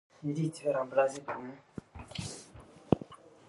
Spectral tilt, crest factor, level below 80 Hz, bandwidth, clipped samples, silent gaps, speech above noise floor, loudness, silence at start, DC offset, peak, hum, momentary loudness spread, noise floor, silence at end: -6 dB/octave; 28 dB; -60 dBFS; 11.5 kHz; under 0.1%; none; 21 dB; -34 LUFS; 0.2 s; under 0.1%; -8 dBFS; none; 19 LU; -54 dBFS; 0.2 s